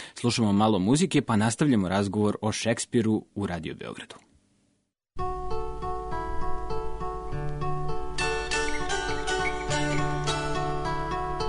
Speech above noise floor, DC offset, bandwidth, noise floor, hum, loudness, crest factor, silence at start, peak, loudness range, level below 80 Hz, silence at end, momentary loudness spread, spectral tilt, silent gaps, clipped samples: 48 dB; under 0.1%; 11 kHz; -73 dBFS; none; -28 LUFS; 16 dB; 0 s; -12 dBFS; 11 LU; -40 dBFS; 0 s; 11 LU; -5 dB/octave; none; under 0.1%